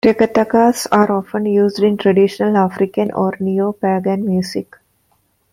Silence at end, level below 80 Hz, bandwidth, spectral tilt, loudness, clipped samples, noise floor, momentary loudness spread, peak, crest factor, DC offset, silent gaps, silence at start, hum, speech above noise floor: 0.9 s; -56 dBFS; 15.5 kHz; -6.5 dB/octave; -15 LUFS; under 0.1%; -61 dBFS; 5 LU; 0 dBFS; 16 dB; under 0.1%; none; 0.05 s; none; 46 dB